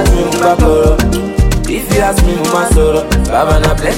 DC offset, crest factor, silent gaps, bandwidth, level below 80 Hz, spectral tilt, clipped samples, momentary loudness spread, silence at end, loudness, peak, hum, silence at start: under 0.1%; 10 dB; none; 17 kHz; -14 dBFS; -5.5 dB/octave; under 0.1%; 4 LU; 0 s; -11 LUFS; 0 dBFS; none; 0 s